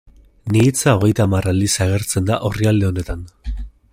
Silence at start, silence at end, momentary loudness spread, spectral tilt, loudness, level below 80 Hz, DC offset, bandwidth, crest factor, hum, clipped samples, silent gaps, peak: 0.45 s; 0.25 s; 16 LU; -5.5 dB/octave; -17 LUFS; -34 dBFS; under 0.1%; 16 kHz; 16 dB; none; under 0.1%; none; -2 dBFS